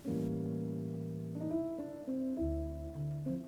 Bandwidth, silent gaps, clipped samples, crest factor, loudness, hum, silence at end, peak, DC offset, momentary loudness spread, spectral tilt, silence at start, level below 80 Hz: 19 kHz; none; under 0.1%; 12 dB; -39 LUFS; none; 0 s; -26 dBFS; under 0.1%; 5 LU; -9.5 dB/octave; 0 s; -50 dBFS